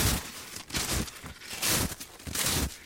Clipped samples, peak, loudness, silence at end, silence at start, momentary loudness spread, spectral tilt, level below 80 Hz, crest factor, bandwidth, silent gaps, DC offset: under 0.1%; -12 dBFS; -30 LUFS; 0 s; 0 s; 13 LU; -2.5 dB/octave; -42 dBFS; 20 dB; 17 kHz; none; under 0.1%